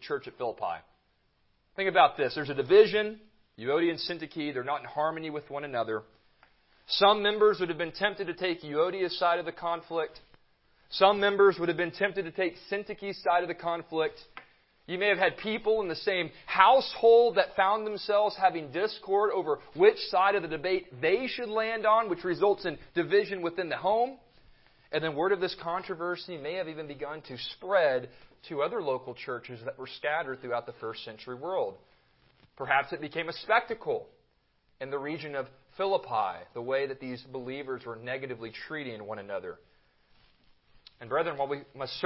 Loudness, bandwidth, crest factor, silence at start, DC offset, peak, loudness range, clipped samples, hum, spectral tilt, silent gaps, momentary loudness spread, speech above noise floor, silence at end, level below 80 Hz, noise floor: -29 LUFS; 5.8 kHz; 26 dB; 0 s; under 0.1%; -4 dBFS; 10 LU; under 0.1%; none; -8.5 dB/octave; none; 15 LU; 42 dB; 0 s; -68 dBFS; -70 dBFS